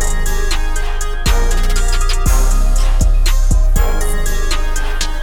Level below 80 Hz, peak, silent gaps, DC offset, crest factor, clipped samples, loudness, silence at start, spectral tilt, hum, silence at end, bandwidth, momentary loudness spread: -12 dBFS; -2 dBFS; none; under 0.1%; 10 dB; under 0.1%; -18 LUFS; 0 s; -3.5 dB/octave; none; 0 s; 17 kHz; 5 LU